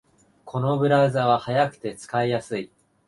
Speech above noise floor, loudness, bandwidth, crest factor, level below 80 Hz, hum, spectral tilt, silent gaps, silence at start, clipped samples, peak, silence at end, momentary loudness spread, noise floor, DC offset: 27 dB; -23 LUFS; 11.5 kHz; 18 dB; -62 dBFS; none; -6.5 dB/octave; none; 0.45 s; under 0.1%; -6 dBFS; 0.4 s; 14 LU; -49 dBFS; under 0.1%